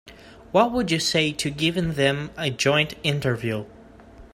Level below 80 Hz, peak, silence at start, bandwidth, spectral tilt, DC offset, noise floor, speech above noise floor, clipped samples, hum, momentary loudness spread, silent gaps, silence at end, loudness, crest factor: -50 dBFS; -4 dBFS; 0.05 s; 16 kHz; -4.5 dB/octave; under 0.1%; -46 dBFS; 24 dB; under 0.1%; none; 7 LU; none; 0.1 s; -23 LUFS; 20 dB